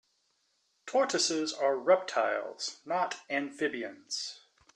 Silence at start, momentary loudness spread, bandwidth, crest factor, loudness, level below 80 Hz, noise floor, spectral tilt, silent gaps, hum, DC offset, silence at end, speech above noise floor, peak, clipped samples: 0.85 s; 11 LU; 11.5 kHz; 20 dB; -31 LUFS; -82 dBFS; -75 dBFS; -2 dB/octave; none; none; under 0.1%; 0.4 s; 44 dB; -12 dBFS; under 0.1%